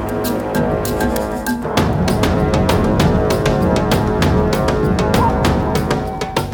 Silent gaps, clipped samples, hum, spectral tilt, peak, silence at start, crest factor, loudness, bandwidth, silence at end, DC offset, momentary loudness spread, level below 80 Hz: none; under 0.1%; none; -6 dB/octave; 0 dBFS; 0 s; 14 dB; -16 LUFS; 19.5 kHz; 0 s; under 0.1%; 5 LU; -26 dBFS